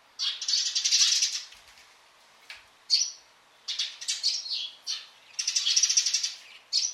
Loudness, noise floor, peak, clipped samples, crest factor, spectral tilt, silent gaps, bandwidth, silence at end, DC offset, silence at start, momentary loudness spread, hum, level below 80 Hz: -25 LUFS; -58 dBFS; -8 dBFS; under 0.1%; 22 dB; 6.5 dB/octave; none; 16 kHz; 0 s; under 0.1%; 0.2 s; 21 LU; none; -82 dBFS